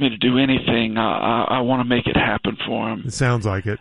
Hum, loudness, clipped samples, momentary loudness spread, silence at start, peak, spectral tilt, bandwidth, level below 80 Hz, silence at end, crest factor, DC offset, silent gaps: none; -20 LUFS; under 0.1%; 6 LU; 0 s; -4 dBFS; -6 dB/octave; 11.5 kHz; -42 dBFS; 0.05 s; 14 dB; under 0.1%; none